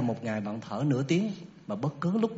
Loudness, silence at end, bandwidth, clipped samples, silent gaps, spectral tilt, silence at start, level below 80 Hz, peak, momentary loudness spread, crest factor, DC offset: -31 LUFS; 0 s; 8 kHz; under 0.1%; none; -7 dB/octave; 0 s; -70 dBFS; -14 dBFS; 9 LU; 16 dB; under 0.1%